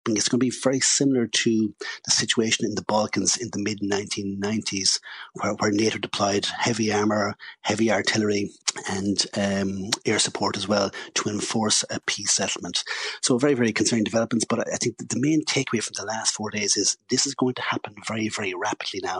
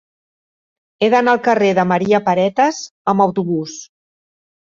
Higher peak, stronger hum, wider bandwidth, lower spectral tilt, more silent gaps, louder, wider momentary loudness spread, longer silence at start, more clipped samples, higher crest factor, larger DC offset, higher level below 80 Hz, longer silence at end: about the same, -2 dBFS vs -2 dBFS; neither; first, 11 kHz vs 7.6 kHz; second, -3 dB/octave vs -5.5 dB/octave; second, none vs 2.91-3.05 s; second, -24 LUFS vs -16 LUFS; about the same, 7 LU vs 9 LU; second, 0.05 s vs 1 s; neither; first, 22 dB vs 16 dB; neither; second, -66 dBFS vs -60 dBFS; second, 0 s vs 0.85 s